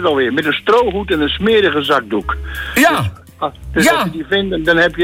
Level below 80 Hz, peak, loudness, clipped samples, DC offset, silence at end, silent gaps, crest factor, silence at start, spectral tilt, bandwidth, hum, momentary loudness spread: -34 dBFS; -2 dBFS; -15 LUFS; under 0.1%; under 0.1%; 0 s; none; 14 dB; 0 s; -4.5 dB/octave; 16.5 kHz; none; 10 LU